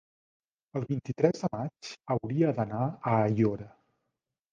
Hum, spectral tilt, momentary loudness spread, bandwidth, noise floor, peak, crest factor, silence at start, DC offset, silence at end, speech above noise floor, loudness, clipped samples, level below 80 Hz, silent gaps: none; -8 dB/octave; 12 LU; 7.6 kHz; -85 dBFS; -10 dBFS; 22 dB; 0.75 s; under 0.1%; 0.85 s; 56 dB; -30 LUFS; under 0.1%; -64 dBFS; none